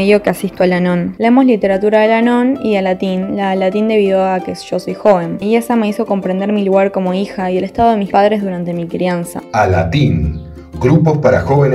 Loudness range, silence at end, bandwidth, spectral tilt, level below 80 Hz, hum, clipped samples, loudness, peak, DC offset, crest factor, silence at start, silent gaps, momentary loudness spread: 2 LU; 0 s; 14.5 kHz; -7.5 dB/octave; -36 dBFS; none; under 0.1%; -14 LUFS; 0 dBFS; under 0.1%; 12 dB; 0 s; none; 8 LU